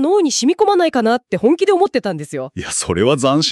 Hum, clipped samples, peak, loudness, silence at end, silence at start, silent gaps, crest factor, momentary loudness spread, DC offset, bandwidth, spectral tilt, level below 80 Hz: none; under 0.1%; -2 dBFS; -16 LUFS; 0 s; 0 s; none; 12 dB; 9 LU; under 0.1%; 12.5 kHz; -4 dB/octave; -48 dBFS